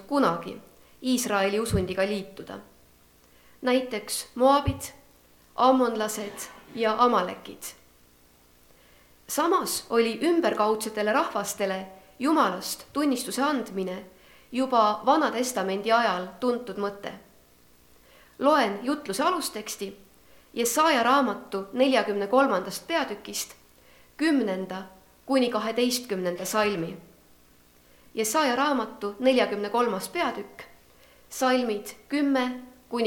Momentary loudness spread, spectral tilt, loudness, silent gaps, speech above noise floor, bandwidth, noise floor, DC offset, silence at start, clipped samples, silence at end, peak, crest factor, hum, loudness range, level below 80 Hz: 16 LU; -4 dB/octave; -26 LUFS; none; 33 dB; 19 kHz; -58 dBFS; under 0.1%; 0 s; under 0.1%; 0 s; -8 dBFS; 20 dB; 60 Hz at -60 dBFS; 4 LU; -56 dBFS